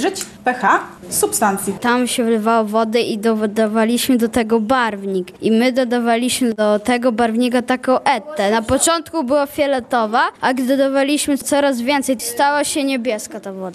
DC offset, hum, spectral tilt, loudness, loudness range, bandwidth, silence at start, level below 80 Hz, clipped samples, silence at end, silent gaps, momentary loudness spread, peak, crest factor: under 0.1%; none; -3.5 dB/octave; -17 LUFS; 1 LU; 13.5 kHz; 0 s; -52 dBFS; under 0.1%; 0 s; none; 4 LU; -2 dBFS; 16 dB